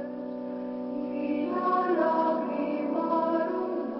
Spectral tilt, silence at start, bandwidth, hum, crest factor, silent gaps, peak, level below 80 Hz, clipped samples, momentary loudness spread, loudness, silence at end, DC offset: -10 dB/octave; 0 s; 5.8 kHz; none; 14 dB; none; -14 dBFS; -74 dBFS; under 0.1%; 10 LU; -29 LUFS; 0 s; under 0.1%